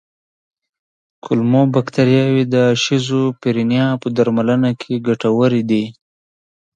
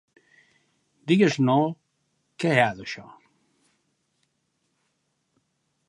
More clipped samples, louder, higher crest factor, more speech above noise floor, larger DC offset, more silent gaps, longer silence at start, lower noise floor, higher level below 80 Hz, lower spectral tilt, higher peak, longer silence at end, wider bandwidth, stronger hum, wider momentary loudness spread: neither; first, -16 LUFS vs -23 LUFS; second, 16 dB vs 24 dB; first, over 75 dB vs 52 dB; neither; neither; first, 1.25 s vs 1.05 s; first, under -90 dBFS vs -74 dBFS; first, -58 dBFS vs -70 dBFS; about the same, -6.5 dB/octave vs -6 dB/octave; first, 0 dBFS vs -4 dBFS; second, 0.85 s vs 2.85 s; second, 9 kHz vs 11.5 kHz; neither; second, 5 LU vs 19 LU